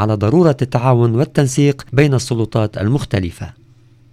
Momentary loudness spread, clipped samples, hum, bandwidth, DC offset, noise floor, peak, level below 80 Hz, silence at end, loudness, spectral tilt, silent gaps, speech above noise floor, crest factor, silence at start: 8 LU; under 0.1%; none; 14 kHz; under 0.1%; -47 dBFS; 0 dBFS; -42 dBFS; 0.6 s; -15 LUFS; -7 dB/octave; none; 32 dB; 16 dB; 0 s